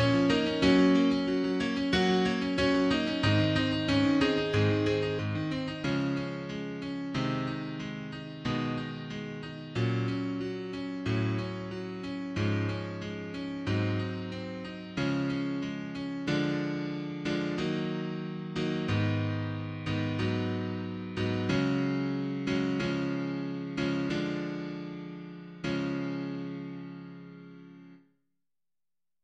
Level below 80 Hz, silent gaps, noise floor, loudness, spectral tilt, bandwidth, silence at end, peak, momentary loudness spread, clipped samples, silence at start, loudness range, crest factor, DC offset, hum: -56 dBFS; none; under -90 dBFS; -31 LUFS; -6.5 dB/octave; 9 kHz; 1.25 s; -12 dBFS; 12 LU; under 0.1%; 0 s; 8 LU; 20 dB; under 0.1%; none